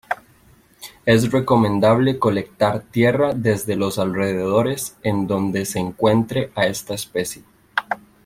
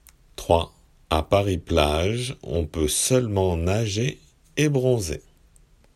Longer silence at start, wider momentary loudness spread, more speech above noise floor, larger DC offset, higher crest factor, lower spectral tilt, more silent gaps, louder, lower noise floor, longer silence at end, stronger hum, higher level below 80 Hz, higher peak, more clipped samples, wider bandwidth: second, 0.1 s vs 0.4 s; about the same, 10 LU vs 11 LU; about the same, 34 dB vs 33 dB; neither; about the same, 18 dB vs 20 dB; about the same, -5.5 dB/octave vs -5 dB/octave; neither; first, -20 LUFS vs -23 LUFS; about the same, -53 dBFS vs -55 dBFS; second, 0.3 s vs 0.75 s; neither; second, -52 dBFS vs -40 dBFS; about the same, -2 dBFS vs -2 dBFS; neither; about the same, 16.5 kHz vs 15.5 kHz